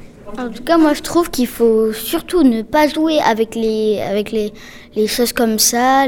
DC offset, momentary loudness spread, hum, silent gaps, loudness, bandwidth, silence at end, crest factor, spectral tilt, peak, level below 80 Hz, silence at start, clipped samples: under 0.1%; 11 LU; none; none; -15 LUFS; 19.5 kHz; 0 s; 14 dB; -3 dB/octave; 0 dBFS; -40 dBFS; 0 s; under 0.1%